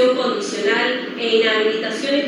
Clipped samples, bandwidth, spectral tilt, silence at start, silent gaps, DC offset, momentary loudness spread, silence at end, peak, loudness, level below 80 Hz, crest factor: under 0.1%; 11 kHz; -3 dB/octave; 0 s; none; under 0.1%; 6 LU; 0 s; -4 dBFS; -18 LUFS; under -90 dBFS; 14 dB